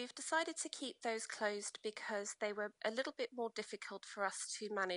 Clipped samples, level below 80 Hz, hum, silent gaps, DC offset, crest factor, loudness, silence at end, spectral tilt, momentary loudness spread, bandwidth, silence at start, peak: under 0.1%; under -90 dBFS; none; none; under 0.1%; 18 dB; -42 LUFS; 0 s; -1.5 dB/octave; 6 LU; 11 kHz; 0 s; -24 dBFS